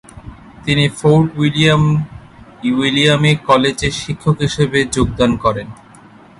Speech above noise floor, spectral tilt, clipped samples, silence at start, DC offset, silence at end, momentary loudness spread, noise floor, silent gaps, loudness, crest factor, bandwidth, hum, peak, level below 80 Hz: 28 dB; -5.5 dB/octave; under 0.1%; 0.15 s; under 0.1%; 0.65 s; 8 LU; -42 dBFS; none; -14 LUFS; 16 dB; 11.5 kHz; none; 0 dBFS; -36 dBFS